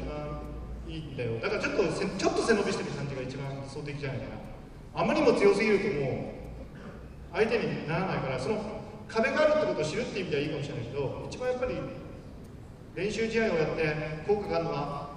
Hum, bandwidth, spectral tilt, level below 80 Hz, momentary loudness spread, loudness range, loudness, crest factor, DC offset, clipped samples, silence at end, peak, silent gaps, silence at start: none; 11 kHz; -5.5 dB/octave; -48 dBFS; 18 LU; 4 LU; -30 LUFS; 20 dB; under 0.1%; under 0.1%; 0 s; -10 dBFS; none; 0 s